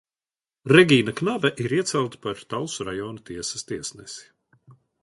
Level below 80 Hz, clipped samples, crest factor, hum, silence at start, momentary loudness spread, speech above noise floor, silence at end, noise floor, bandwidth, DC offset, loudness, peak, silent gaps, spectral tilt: -60 dBFS; under 0.1%; 24 dB; none; 0.65 s; 19 LU; over 67 dB; 0.8 s; under -90 dBFS; 11.5 kHz; under 0.1%; -23 LUFS; 0 dBFS; none; -4.5 dB/octave